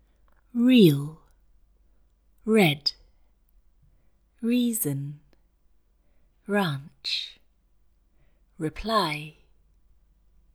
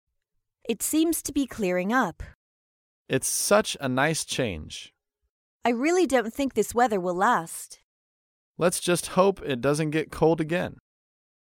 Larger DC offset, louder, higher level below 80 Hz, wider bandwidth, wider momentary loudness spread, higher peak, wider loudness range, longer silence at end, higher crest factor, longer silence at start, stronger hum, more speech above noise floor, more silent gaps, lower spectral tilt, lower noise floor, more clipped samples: neither; about the same, -25 LUFS vs -25 LUFS; about the same, -56 dBFS vs -54 dBFS; first, 19.5 kHz vs 17 kHz; first, 20 LU vs 12 LU; about the same, -6 dBFS vs -8 dBFS; first, 9 LU vs 2 LU; first, 1.25 s vs 0.75 s; about the same, 22 dB vs 20 dB; about the same, 0.55 s vs 0.65 s; neither; second, 40 dB vs 53 dB; second, none vs 2.35-3.05 s, 5.29-5.60 s, 7.84-8.55 s; about the same, -5 dB/octave vs -4 dB/octave; second, -63 dBFS vs -78 dBFS; neither